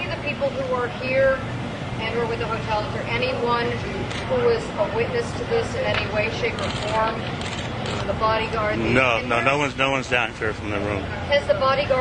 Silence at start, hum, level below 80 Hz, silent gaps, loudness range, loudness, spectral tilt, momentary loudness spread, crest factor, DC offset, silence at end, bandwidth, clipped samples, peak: 0 s; none; -42 dBFS; none; 3 LU; -23 LUFS; -5.5 dB/octave; 7 LU; 20 dB; under 0.1%; 0 s; 11 kHz; under 0.1%; -2 dBFS